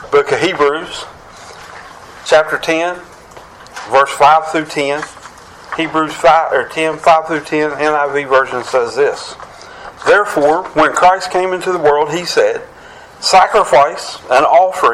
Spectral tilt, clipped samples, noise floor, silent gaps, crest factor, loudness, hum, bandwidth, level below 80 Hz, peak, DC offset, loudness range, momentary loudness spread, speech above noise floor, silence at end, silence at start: -3.5 dB/octave; under 0.1%; -37 dBFS; none; 14 dB; -13 LUFS; none; 15 kHz; -48 dBFS; 0 dBFS; under 0.1%; 3 LU; 19 LU; 24 dB; 0 s; 0 s